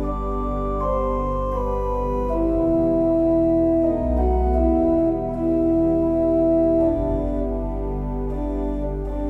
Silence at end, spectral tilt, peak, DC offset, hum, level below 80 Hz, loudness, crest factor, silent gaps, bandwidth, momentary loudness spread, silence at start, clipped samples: 0 s; -11 dB/octave; -8 dBFS; under 0.1%; none; -28 dBFS; -21 LUFS; 12 dB; none; 3.7 kHz; 8 LU; 0 s; under 0.1%